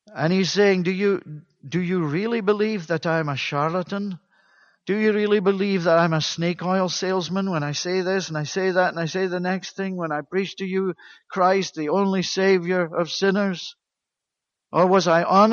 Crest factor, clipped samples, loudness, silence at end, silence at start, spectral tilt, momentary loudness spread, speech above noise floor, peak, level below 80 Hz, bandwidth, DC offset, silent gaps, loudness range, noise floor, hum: 18 dB; under 0.1%; -22 LUFS; 0 s; 0.1 s; -5.5 dB/octave; 10 LU; 63 dB; -4 dBFS; -68 dBFS; 7.2 kHz; under 0.1%; none; 3 LU; -85 dBFS; none